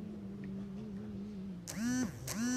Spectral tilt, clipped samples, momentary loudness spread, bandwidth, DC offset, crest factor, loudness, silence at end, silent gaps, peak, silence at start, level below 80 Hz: -4.5 dB/octave; under 0.1%; 9 LU; 15.5 kHz; under 0.1%; 18 dB; -41 LUFS; 0 s; none; -22 dBFS; 0 s; -60 dBFS